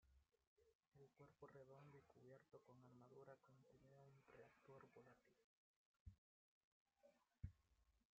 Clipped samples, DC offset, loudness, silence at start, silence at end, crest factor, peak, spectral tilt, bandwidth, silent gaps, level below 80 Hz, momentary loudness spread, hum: under 0.1%; under 0.1%; -67 LUFS; 0 s; 0.15 s; 26 dB; -42 dBFS; -7 dB/octave; 6.8 kHz; 0.47-0.57 s, 0.75-0.79 s, 0.88-0.92 s, 5.44-5.94 s, 6.00-6.06 s, 6.18-6.86 s; -80 dBFS; 7 LU; none